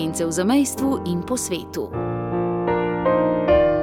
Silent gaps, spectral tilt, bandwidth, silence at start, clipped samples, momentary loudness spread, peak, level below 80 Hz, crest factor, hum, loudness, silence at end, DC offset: none; -5.5 dB/octave; 17.5 kHz; 0 s; under 0.1%; 9 LU; -6 dBFS; -42 dBFS; 16 dB; none; -21 LUFS; 0 s; under 0.1%